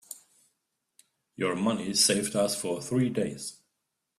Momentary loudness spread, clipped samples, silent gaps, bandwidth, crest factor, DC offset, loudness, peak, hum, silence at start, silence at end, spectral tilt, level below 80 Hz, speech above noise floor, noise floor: 17 LU; under 0.1%; none; 15.5 kHz; 20 dB; under 0.1%; -27 LUFS; -10 dBFS; none; 0.1 s; 0.65 s; -3.5 dB/octave; -68 dBFS; 54 dB; -82 dBFS